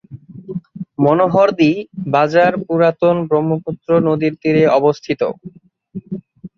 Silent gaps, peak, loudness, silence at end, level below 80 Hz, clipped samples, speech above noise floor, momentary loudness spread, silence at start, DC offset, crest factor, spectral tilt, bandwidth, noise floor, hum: none; -2 dBFS; -15 LUFS; 0.1 s; -56 dBFS; under 0.1%; 21 dB; 18 LU; 0.1 s; under 0.1%; 14 dB; -8 dB/octave; 7 kHz; -35 dBFS; none